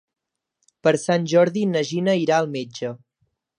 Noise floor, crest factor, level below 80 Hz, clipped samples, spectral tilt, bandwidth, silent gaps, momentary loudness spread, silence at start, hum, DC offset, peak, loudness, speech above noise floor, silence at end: -75 dBFS; 18 dB; -72 dBFS; under 0.1%; -5.5 dB/octave; 11 kHz; none; 12 LU; 0.85 s; none; under 0.1%; -4 dBFS; -21 LUFS; 55 dB; 0.6 s